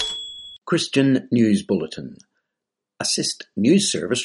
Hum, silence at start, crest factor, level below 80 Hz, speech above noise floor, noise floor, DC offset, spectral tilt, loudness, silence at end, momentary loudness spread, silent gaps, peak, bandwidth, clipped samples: none; 0 s; 16 dB; -60 dBFS; 64 dB; -84 dBFS; under 0.1%; -4 dB/octave; -20 LUFS; 0 s; 15 LU; none; -6 dBFS; 11.5 kHz; under 0.1%